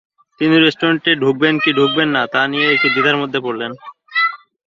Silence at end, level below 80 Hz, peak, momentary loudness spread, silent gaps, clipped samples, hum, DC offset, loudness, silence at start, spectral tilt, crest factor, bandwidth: 0.3 s; -60 dBFS; -2 dBFS; 9 LU; none; under 0.1%; none; under 0.1%; -15 LUFS; 0.4 s; -6 dB/octave; 16 dB; 7.4 kHz